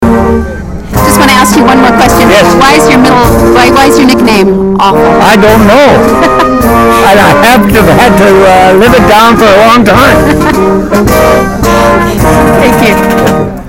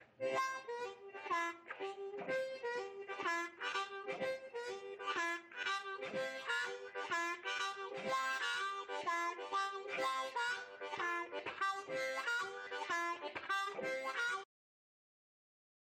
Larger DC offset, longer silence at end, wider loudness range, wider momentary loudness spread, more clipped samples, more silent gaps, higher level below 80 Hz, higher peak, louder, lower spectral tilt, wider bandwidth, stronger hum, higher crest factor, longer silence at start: neither; second, 0 s vs 1.55 s; about the same, 2 LU vs 3 LU; about the same, 5 LU vs 7 LU; first, 10% vs under 0.1%; neither; first, -20 dBFS vs -88 dBFS; first, 0 dBFS vs -26 dBFS; first, -3 LUFS vs -40 LUFS; first, -5 dB/octave vs -1.5 dB/octave; about the same, 18 kHz vs 16.5 kHz; neither; second, 4 dB vs 14 dB; about the same, 0 s vs 0 s